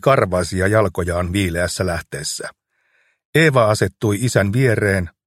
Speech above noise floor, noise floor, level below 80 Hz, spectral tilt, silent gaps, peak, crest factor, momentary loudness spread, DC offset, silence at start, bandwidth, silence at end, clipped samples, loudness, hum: 45 dB; -63 dBFS; -42 dBFS; -5.5 dB/octave; 3.25-3.33 s; 0 dBFS; 18 dB; 10 LU; under 0.1%; 0.05 s; 15.5 kHz; 0.15 s; under 0.1%; -18 LUFS; none